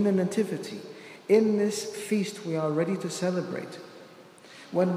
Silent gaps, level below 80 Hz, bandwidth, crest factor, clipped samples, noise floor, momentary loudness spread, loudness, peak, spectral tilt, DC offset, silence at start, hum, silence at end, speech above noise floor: none; -80 dBFS; 15.5 kHz; 18 dB; under 0.1%; -50 dBFS; 21 LU; -28 LUFS; -10 dBFS; -6 dB/octave; under 0.1%; 0 s; none; 0 s; 23 dB